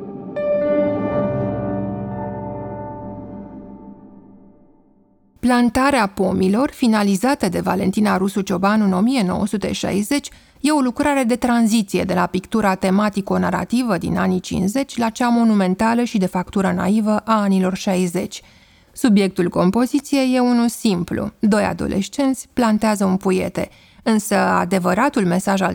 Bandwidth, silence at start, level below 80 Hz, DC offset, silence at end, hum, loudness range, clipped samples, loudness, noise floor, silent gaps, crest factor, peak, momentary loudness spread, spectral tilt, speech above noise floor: 19.5 kHz; 0 s; -46 dBFS; under 0.1%; 0 s; none; 5 LU; under 0.1%; -18 LUFS; -55 dBFS; none; 16 dB; -2 dBFS; 10 LU; -6 dB/octave; 37 dB